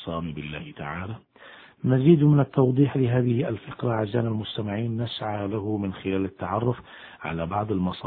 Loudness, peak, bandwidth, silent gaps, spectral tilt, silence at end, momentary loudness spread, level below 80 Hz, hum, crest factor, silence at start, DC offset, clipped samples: -25 LUFS; -6 dBFS; 4.5 kHz; none; -11.5 dB/octave; 0 s; 15 LU; -54 dBFS; none; 20 dB; 0 s; under 0.1%; under 0.1%